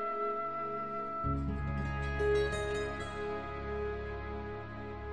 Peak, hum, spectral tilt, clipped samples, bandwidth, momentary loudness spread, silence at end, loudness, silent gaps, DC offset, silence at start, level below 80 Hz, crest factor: -20 dBFS; none; -6.5 dB/octave; under 0.1%; 11 kHz; 10 LU; 0 s; -36 LUFS; none; 0.3%; 0 s; -44 dBFS; 16 dB